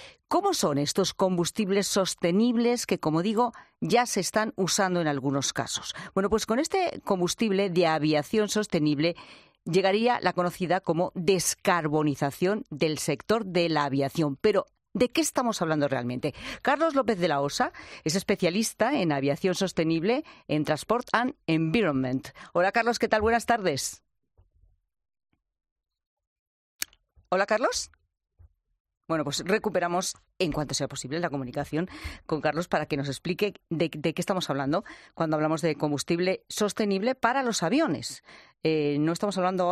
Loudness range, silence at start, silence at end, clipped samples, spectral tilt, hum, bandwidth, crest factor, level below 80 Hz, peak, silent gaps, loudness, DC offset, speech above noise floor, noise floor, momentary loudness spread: 5 LU; 0 s; 0 s; under 0.1%; -4.5 dB/octave; none; 14 kHz; 20 dB; -58 dBFS; -8 dBFS; 25.72-25.76 s, 26.07-26.17 s, 26.27-26.79 s, 28.80-28.85 s; -27 LUFS; under 0.1%; 38 dB; -65 dBFS; 7 LU